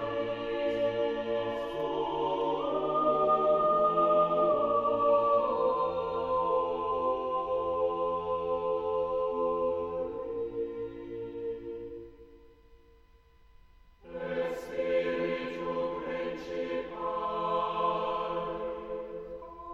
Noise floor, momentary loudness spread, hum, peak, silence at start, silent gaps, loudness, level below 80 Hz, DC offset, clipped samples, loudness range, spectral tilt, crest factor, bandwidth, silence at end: -60 dBFS; 13 LU; none; -16 dBFS; 0 s; none; -30 LUFS; -58 dBFS; under 0.1%; under 0.1%; 13 LU; -7 dB/octave; 16 dB; 7.6 kHz; 0 s